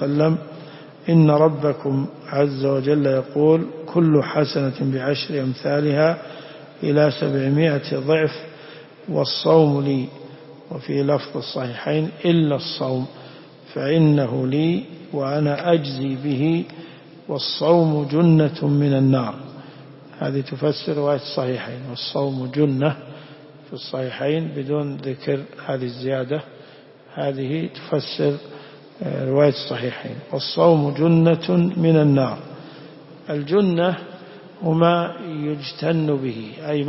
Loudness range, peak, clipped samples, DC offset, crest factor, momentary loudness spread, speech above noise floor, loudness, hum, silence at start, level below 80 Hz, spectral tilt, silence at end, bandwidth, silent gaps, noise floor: 7 LU; -4 dBFS; under 0.1%; under 0.1%; 18 dB; 18 LU; 26 dB; -20 LUFS; none; 0 s; -62 dBFS; -10.5 dB/octave; 0 s; 5.8 kHz; none; -45 dBFS